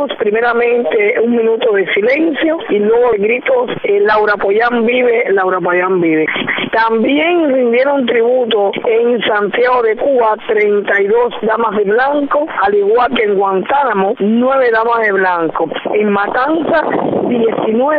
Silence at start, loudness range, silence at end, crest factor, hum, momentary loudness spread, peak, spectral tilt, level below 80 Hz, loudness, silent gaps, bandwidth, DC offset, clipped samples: 0 s; 1 LU; 0 s; 10 dB; none; 3 LU; -2 dBFS; -8 dB/octave; -52 dBFS; -12 LUFS; none; 5.2 kHz; under 0.1%; under 0.1%